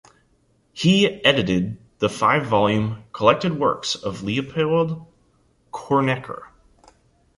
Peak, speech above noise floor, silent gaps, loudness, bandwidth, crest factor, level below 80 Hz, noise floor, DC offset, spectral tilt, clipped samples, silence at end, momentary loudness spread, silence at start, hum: -2 dBFS; 42 dB; none; -21 LUFS; 11.5 kHz; 20 dB; -52 dBFS; -62 dBFS; under 0.1%; -5.5 dB/octave; under 0.1%; 0.9 s; 15 LU; 0.75 s; none